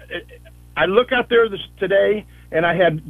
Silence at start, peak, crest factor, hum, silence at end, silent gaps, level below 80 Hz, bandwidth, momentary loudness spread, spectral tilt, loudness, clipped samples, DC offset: 0.1 s; -2 dBFS; 18 dB; 60 Hz at -45 dBFS; 0 s; none; -46 dBFS; 12.5 kHz; 12 LU; -7 dB/octave; -18 LUFS; under 0.1%; under 0.1%